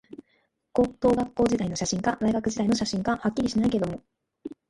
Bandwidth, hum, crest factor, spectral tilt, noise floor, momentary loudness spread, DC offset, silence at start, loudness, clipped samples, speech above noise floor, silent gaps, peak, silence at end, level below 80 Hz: 11.5 kHz; none; 18 dB; -5.5 dB/octave; -70 dBFS; 7 LU; under 0.1%; 0.1 s; -26 LUFS; under 0.1%; 45 dB; none; -10 dBFS; 0.15 s; -50 dBFS